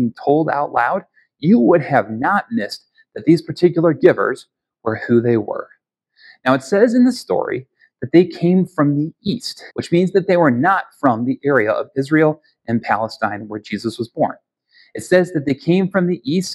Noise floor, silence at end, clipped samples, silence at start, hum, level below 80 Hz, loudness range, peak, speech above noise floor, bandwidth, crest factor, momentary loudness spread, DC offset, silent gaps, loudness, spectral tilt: -58 dBFS; 0 s; under 0.1%; 0 s; none; -60 dBFS; 3 LU; 0 dBFS; 41 dB; 12.5 kHz; 18 dB; 13 LU; under 0.1%; none; -17 LUFS; -7 dB/octave